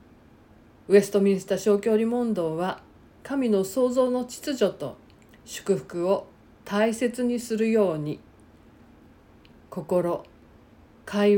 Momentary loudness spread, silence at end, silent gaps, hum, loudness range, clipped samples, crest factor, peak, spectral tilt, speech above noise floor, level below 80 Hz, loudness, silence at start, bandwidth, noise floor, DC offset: 15 LU; 0 s; none; none; 4 LU; under 0.1%; 20 dB; -6 dBFS; -6 dB/octave; 30 dB; -62 dBFS; -25 LUFS; 0.9 s; 17 kHz; -53 dBFS; under 0.1%